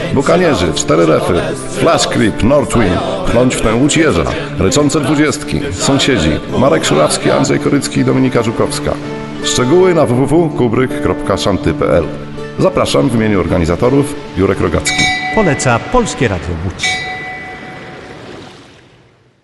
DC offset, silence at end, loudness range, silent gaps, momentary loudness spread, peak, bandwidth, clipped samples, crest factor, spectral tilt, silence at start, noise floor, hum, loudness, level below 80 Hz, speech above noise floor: under 0.1%; 0.8 s; 2 LU; none; 10 LU; 0 dBFS; 12 kHz; under 0.1%; 12 dB; -5 dB/octave; 0 s; -47 dBFS; none; -12 LUFS; -30 dBFS; 35 dB